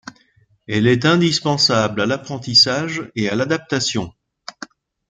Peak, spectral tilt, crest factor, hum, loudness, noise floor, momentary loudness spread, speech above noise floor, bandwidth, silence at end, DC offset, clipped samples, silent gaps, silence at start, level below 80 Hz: -2 dBFS; -4 dB/octave; 18 dB; none; -17 LUFS; -58 dBFS; 22 LU; 40 dB; 12 kHz; 0.45 s; under 0.1%; under 0.1%; none; 0.05 s; -56 dBFS